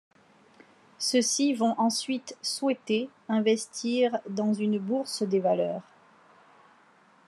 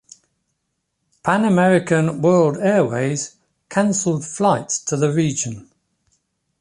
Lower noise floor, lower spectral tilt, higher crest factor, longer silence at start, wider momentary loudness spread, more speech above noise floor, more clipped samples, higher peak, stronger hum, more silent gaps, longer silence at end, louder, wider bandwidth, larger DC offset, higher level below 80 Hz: second, -60 dBFS vs -74 dBFS; second, -4 dB/octave vs -5.5 dB/octave; about the same, 16 dB vs 16 dB; second, 1 s vs 1.25 s; second, 7 LU vs 10 LU; second, 33 dB vs 56 dB; neither; second, -12 dBFS vs -4 dBFS; neither; neither; first, 1.45 s vs 1 s; second, -28 LUFS vs -18 LUFS; about the same, 12.5 kHz vs 11.5 kHz; neither; second, -88 dBFS vs -60 dBFS